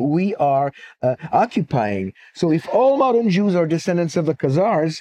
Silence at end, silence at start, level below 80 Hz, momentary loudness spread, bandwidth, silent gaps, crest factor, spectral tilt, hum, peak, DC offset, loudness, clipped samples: 0 s; 0 s; -62 dBFS; 7 LU; 10 kHz; none; 14 dB; -7.5 dB/octave; none; -4 dBFS; under 0.1%; -19 LUFS; under 0.1%